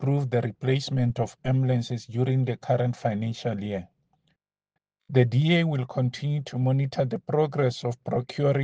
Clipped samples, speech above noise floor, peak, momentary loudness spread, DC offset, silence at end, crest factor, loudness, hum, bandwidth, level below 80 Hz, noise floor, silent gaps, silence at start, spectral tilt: under 0.1%; 59 dB; -6 dBFS; 7 LU; under 0.1%; 0 s; 20 dB; -26 LUFS; none; 7.8 kHz; -60 dBFS; -84 dBFS; none; 0 s; -7.5 dB/octave